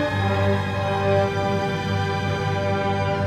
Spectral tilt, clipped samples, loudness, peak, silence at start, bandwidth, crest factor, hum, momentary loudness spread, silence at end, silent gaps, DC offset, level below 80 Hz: -6.5 dB/octave; under 0.1%; -23 LUFS; -8 dBFS; 0 s; 10 kHz; 14 dB; 50 Hz at -35 dBFS; 3 LU; 0 s; none; under 0.1%; -46 dBFS